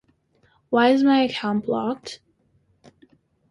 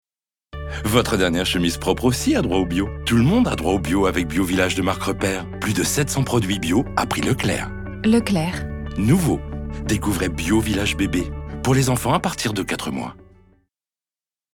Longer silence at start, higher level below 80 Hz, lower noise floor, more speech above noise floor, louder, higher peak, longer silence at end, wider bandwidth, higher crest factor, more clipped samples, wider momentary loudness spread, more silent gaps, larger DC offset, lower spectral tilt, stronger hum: first, 0.7 s vs 0.55 s; second, -66 dBFS vs -34 dBFS; second, -64 dBFS vs under -90 dBFS; second, 44 dB vs over 70 dB; about the same, -21 LUFS vs -21 LUFS; second, -6 dBFS vs 0 dBFS; about the same, 1.35 s vs 1.4 s; second, 10.5 kHz vs 19 kHz; about the same, 18 dB vs 20 dB; neither; first, 18 LU vs 8 LU; neither; neither; about the same, -5.5 dB/octave vs -5 dB/octave; neither